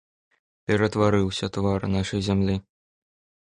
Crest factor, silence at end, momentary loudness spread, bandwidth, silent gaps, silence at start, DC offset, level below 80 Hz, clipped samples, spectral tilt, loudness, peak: 18 dB; 0.85 s; 6 LU; 11 kHz; none; 0.7 s; under 0.1%; -44 dBFS; under 0.1%; -6.5 dB/octave; -24 LUFS; -8 dBFS